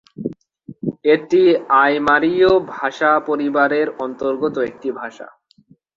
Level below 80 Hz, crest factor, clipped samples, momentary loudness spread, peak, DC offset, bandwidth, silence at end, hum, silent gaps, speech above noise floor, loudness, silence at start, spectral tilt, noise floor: -54 dBFS; 16 dB; under 0.1%; 15 LU; 0 dBFS; under 0.1%; 7.4 kHz; 0.7 s; none; none; 37 dB; -17 LUFS; 0.2 s; -6.5 dB/octave; -53 dBFS